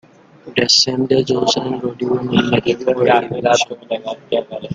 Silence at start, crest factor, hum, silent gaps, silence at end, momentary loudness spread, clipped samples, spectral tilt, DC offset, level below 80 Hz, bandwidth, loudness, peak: 0.45 s; 16 dB; none; none; 0 s; 10 LU; under 0.1%; -4 dB/octave; under 0.1%; -52 dBFS; 9.4 kHz; -16 LUFS; 0 dBFS